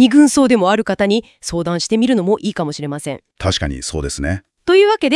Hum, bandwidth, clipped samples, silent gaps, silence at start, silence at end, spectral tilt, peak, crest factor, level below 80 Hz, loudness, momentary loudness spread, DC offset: none; 12 kHz; under 0.1%; none; 0 s; 0 s; -5 dB/octave; 0 dBFS; 14 dB; -38 dBFS; -16 LUFS; 12 LU; under 0.1%